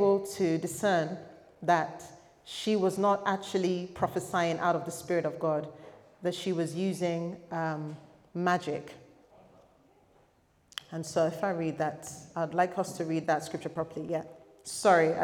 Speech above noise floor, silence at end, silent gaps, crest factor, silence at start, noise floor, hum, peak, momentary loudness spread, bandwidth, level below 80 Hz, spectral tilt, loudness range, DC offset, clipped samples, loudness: 36 dB; 0 s; none; 22 dB; 0 s; -67 dBFS; none; -10 dBFS; 15 LU; 18.5 kHz; -72 dBFS; -5.5 dB/octave; 6 LU; under 0.1%; under 0.1%; -31 LUFS